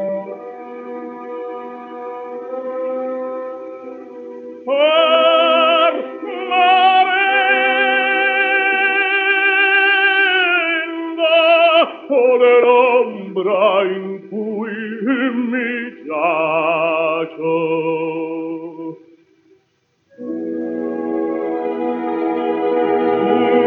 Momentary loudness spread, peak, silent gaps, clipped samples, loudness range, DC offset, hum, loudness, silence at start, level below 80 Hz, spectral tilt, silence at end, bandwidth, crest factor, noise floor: 18 LU; -2 dBFS; none; under 0.1%; 13 LU; under 0.1%; none; -15 LUFS; 0 s; -82 dBFS; -6.5 dB/octave; 0 s; 4.7 kHz; 14 dB; -63 dBFS